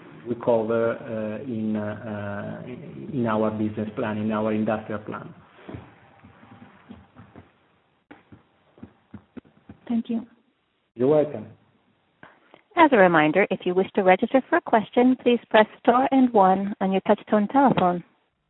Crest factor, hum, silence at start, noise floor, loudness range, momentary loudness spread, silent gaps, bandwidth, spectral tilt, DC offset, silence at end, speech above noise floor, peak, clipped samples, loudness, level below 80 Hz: 22 dB; none; 0.15 s; -69 dBFS; 16 LU; 15 LU; none; 4.1 kHz; -11 dB/octave; under 0.1%; 0.45 s; 47 dB; -2 dBFS; under 0.1%; -22 LUFS; -64 dBFS